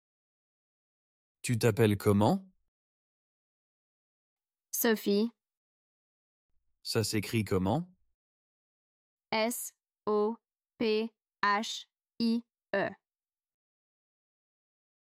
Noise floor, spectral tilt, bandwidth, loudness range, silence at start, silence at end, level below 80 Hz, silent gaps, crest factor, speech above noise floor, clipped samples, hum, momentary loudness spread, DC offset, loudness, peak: under -90 dBFS; -5 dB/octave; 16 kHz; 4 LU; 1.45 s; 2.2 s; -70 dBFS; 2.68-4.37 s, 5.57-6.49 s, 8.14-9.17 s; 22 dB; over 61 dB; under 0.1%; none; 13 LU; under 0.1%; -31 LUFS; -12 dBFS